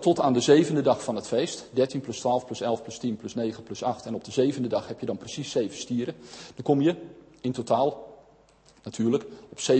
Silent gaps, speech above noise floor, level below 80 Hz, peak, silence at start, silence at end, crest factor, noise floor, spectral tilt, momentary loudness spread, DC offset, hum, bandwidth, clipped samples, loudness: none; 32 dB; -66 dBFS; -6 dBFS; 0 s; 0 s; 20 dB; -58 dBFS; -5.5 dB/octave; 12 LU; under 0.1%; none; 8.8 kHz; under 0.1%; -27 LUFS